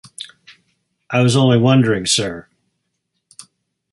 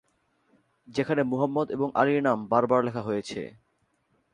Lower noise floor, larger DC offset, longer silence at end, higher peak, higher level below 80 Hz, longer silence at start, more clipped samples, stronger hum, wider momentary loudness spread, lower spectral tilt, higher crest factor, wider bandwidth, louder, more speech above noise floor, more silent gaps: about the same, -73 dBFS vs -72 dBFS; neither; first, 1.5 s vs 0.85 s; first, -2 dBFS vs -8 dBFS; first, -52 dBFS vs -66 dBFS; second, 0.2 s vs 0.9 s; neither; neither; first, 21 LU vs 11 LU; second, -5 dB/octave vs -7 dB/octave; about the same, 18 dB vs 20 dB; about the same, 11.5 kHz vs 11 kHz; first, -15 LUFS vs -26 LUFS; first, 59 dB vs 46 dB; neither